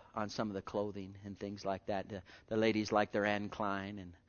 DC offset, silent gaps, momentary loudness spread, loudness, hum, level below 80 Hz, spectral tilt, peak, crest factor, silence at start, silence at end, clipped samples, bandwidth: under 0.1%; none; 14 LU; -38 LUFS; none; -68 dBFS; -4 dB/octave; -16 dBFS; 22 dB; 0 s; 0.1 s; under 0.1%; 6.8 kHz